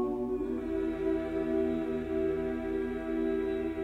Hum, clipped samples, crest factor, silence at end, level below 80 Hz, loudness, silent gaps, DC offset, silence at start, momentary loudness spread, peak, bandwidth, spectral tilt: none; under 0.1%; 12 dB; 0 s; -50 dBFS; -32 LUFS; none; under 0.1%; 0 s; 3 LU; -20 dBFS; 8.2 kHz; -8 dB/octave